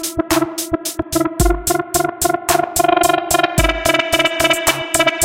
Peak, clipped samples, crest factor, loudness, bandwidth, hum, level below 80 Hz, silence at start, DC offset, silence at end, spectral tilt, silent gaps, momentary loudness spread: 0 dBFS; under 0.1%; 16 dB; -16 LUFS; 17 kHz; none; -28 dBFS; 0 s; 0.1%; 0 s; -3 dB/octave; none; 6 LU